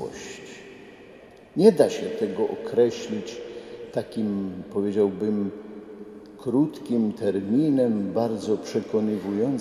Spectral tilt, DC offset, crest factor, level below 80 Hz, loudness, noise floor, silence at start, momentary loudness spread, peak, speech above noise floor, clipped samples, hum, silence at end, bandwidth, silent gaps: -7 dB/octave; under 0.1%; 22 dB; -64 dBFS; -25 LUFS; -48 dBFS; 0 s; 19 LU; -4 dBFS; 24 dB; under 0.1%; none; 0 s; 14 kHz; none